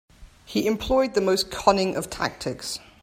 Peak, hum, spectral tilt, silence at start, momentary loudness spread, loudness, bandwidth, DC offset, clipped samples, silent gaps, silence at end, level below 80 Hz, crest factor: -2 dBFS; none; -4 dB/octave; 0.2 s; 10 LU; -24 LUFS; 16.5 kHz; under 0.1%; under 0.1%; none; 0.25 s; -46 dBFS; 24 dB